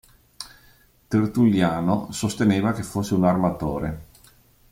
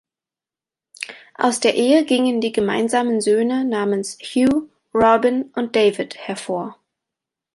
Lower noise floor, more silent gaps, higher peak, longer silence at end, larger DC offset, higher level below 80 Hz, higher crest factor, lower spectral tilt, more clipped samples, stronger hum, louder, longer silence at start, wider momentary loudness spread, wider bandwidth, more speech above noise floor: second, -56 dBFS vs -90 dBFS; neither; second, -6 dBFS vs -2 dBFS; about the same, 0.7 s vs 0.8 s; neither; first, -48 dBFS vs -56 dBFS; about the same, 16 dB vs 18 dB; first, -6.5 dB/octave vs -4 dB/octave; neither; neither; second, -22 LUFS vs -19 LUFS; second, 0.4 s vs 1 s; first, 20 LU vs 12 LU; first, 16.5 kHz vs 11.5 kHz; second, 34 dB vs 72 dB